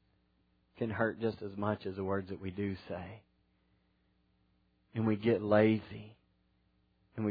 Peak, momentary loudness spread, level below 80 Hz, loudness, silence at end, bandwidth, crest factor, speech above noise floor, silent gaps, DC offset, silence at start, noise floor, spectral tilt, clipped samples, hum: -14 dBFS; 17 LU; -70 dBFS; -34 LUFS; 0 s; 5 kHz; 22 dB; 41 dB; none; under 0.1%; 0.8 s; -74 dBFS; -6.5 dB/octave; under 0.1%; none